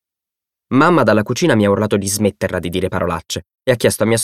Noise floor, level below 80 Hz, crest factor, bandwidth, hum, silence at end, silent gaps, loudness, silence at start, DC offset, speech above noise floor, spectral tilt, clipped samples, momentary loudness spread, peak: -86 dBFS; -46 dBFS; 16 dB; 16 kHz; none; 0 s; none; -16 LUFS; 0.7 s; under 0.1%; 70 dB; -5 dB/octave; under 0.1%; 9 LU; 0 dBFS